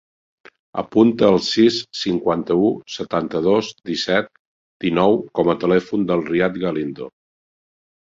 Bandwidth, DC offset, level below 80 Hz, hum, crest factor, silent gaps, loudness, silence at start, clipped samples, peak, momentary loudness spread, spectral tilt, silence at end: 7.8 kHz; under 0.1%; -54 dBFS; none; 18 dB; 4.39-4.80 s; -19 LUFS; 0.75 s; under 0.1%; -2 dBFS; 11 LU; -6 dB/octave; 0.95 s